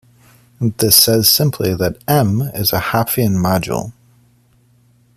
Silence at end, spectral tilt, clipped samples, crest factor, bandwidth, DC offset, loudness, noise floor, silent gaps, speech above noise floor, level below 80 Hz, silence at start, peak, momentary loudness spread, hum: 1.25 s; -4 dB/octave; under 0.1%; 16 dB; 15.5 kHz; under 0.1%; -14 LUFS; -53 dBFS; none; 39 dB; -46 dBFS; 0.6 s; 0 dBFS; 13 LU; none